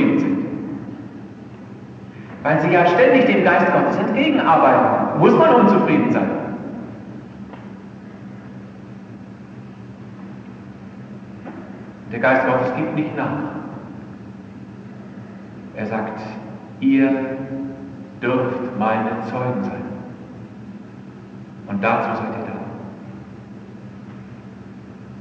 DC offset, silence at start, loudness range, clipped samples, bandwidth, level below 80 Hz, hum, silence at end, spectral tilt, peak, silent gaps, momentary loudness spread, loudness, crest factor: under 0.1%; 0 s; 22 LU; under 0.1%; 7.2 kHz; -58 dBFS; none; 0 s; -8 dB/octave; 0 dBFS; none; 24 LU; -18 LUFS; 20 dB